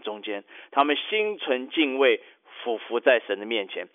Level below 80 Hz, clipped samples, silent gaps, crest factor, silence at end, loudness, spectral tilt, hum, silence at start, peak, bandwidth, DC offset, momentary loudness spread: -84 dBFS; under 0.1%; none; 18 dB; 0.1 s; -25 LUFS; -5.5 dB/octave; none; 0.05 s; -8 dBFS; 4 kHz; under 0.1%; 12 LU